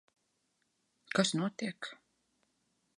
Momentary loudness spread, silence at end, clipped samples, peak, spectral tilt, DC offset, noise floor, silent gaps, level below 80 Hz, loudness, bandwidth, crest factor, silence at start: 15 LU; 1.05 s; under 0.1%; -12 dBFS; -4 dB/octave; under 0.1%; -79 dBFS; none; -84 dBFS; -34 LUFS; 11.5 kHz; 26 dB; 1.1 s